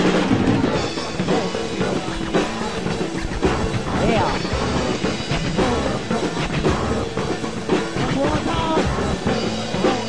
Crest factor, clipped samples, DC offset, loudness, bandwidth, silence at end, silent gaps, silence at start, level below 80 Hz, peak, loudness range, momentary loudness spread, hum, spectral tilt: 14 dB; under 0.1%; 2%; -21 LUFS; 10.5 kHz; 0 s; none; 0 s; -34 dBFS; -6 dBFS; 1 LU; 6 LU; none; -5.5 dB/octave